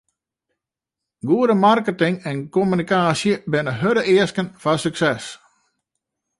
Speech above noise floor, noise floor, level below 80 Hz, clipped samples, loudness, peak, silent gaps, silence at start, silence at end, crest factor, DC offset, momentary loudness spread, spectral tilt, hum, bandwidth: 67 dB; -85 dBFS; -60 dBFS; under 0.1%; -19 LUFS; -4 dBFS; none; 1.25 s; 1.05 s; 18 dB; under 0.1%; 8 LU; -5.5 dB/octave; none; 11.5 kHz